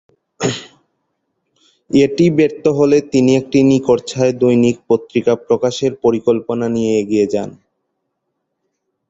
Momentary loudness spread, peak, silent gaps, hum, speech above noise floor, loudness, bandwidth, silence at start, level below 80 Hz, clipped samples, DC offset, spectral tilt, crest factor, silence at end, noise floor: 8 LU; 0 dBFS; none; none; 59 dB; -15 LUFS; 8 kHz; 0.4 s; -52 dBFS; under 0.1%; under 0.1%; -6.5 dB/octave; 16 dB; 1.55 s; -73 dBFS